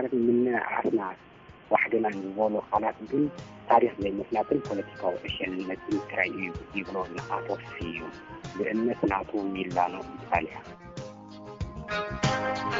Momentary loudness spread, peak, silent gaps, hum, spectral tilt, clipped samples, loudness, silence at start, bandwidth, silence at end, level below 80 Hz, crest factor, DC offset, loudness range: 16 LU; -6 dBFS; none; none; -4.5 dB/octave; under 0.1%; -29 LUFS; 0 s; 7.6 kHz; 0 s; -54 dBFS; 22 dB; under 0.1%; 5 LU